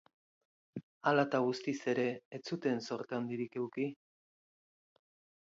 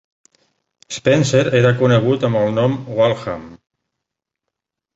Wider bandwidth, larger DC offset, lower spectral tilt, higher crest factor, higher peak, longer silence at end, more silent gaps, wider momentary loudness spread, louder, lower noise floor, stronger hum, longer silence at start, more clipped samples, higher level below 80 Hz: about the same, 7.6 kHz vs 8 kHz; neither; second, -4.5 dB/octave vs -6 dB/octave; first, 22 dB vs 16 dB; second, -14 dBFS vs -2 dBFS; about the same, 1.5 s vs 1.4 s; first, 0.83-1.01 s, 2.25-2.31 s vs none; about the same, 13 LU vs 12 LU; second, -36 LUFS vs -16 LUFS; first, under -90 dBFS vs -82 dBFS; neither; second, 0.75 s vs 0.9 s; neither; second, -86 dBFS vs -52 dBFS